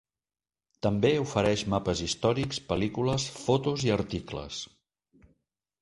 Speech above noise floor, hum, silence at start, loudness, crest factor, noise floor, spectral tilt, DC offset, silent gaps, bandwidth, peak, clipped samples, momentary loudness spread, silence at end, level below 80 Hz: over 62 dB; none; 0.85 s; -29 LUFS; 20 dB; under -90 dBFS; -5 dB/octave; under 0.1%; none; 11.5 kHz; -8 dBFS; under 0.1%; 11 LU; 1.15 s; -50 dBFS